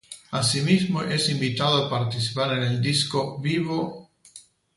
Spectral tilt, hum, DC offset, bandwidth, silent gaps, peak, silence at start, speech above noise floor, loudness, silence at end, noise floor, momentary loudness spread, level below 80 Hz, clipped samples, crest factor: -4.5 dB/octave; none; under 0.1%; 11.5 kHz; none; -8 dBFS; 0.1 s; 27 dB; -24 LUFS; 0.35 s; -51 dBFS; 5 LU; -60 dBFS; under 0.1%; 18 dB